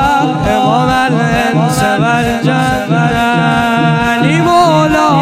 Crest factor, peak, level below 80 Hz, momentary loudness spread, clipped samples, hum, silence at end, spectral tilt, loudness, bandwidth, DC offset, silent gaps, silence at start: 10 dB; 0 dBFS; -32 dBFS; 3 LU; under 0.1%; none; 0 s; -6 dB/octave; -11 LUFS; 15.5 kHz; under 0.1%; none; 0 s